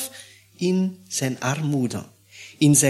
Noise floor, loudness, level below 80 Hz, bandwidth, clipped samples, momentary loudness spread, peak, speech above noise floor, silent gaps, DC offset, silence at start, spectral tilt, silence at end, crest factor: -46 dBFS; -24 LUFS; -64 dBFS; 15.5 kHz; under 0.1%; 21 LU; -4 dBFS; 25 dB; none; under 0.1%; 0 s; -4.5 dB/octave; 0 s; 20 dB